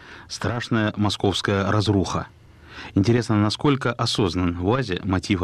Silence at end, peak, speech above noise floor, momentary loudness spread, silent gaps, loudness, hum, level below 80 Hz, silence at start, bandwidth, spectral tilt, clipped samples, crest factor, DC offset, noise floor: 0 s; -8 dBFS; 20 dB; 9 LU; none; -22 LUFS; none; -46 dBFS; 0 s; 12 kHz; -6 dB/octave; under 0.1%; 14 dB; under 0.1%; -41 dBFS